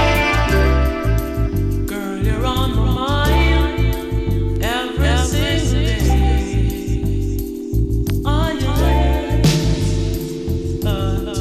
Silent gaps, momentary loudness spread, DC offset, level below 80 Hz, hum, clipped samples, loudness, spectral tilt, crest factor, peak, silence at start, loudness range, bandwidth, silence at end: none; 6 LU; under 0.1%; -20 dBFS; none; under 0.1%; -18 LUFS; -6 dB/octave; 12 dB; -6 dBFS; 0 s; 1 LU; 14.5 kHz; 0 s